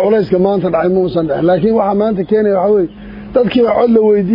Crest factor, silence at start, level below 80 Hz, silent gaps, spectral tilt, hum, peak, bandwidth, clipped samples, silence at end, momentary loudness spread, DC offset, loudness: 12 dB; 0 s; -42 dBFS; none; -10.5 dB/octave; none; 0 dBFS; 5.4 kHz; under 0.1%; 0 s; 5 LU; under 0.1%; -12 LUFS